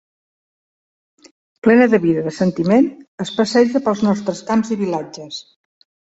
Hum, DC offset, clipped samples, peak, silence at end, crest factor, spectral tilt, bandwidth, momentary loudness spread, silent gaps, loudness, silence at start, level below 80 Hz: none; under 0.1%; under 0.1%; 0 dBFS; 0.75 s; 18 dB; -6 dB/octave; 8 kHz; 16 LU; 3.08-3.18 s; -17 LUFS; 1.65 s; -58 dBFS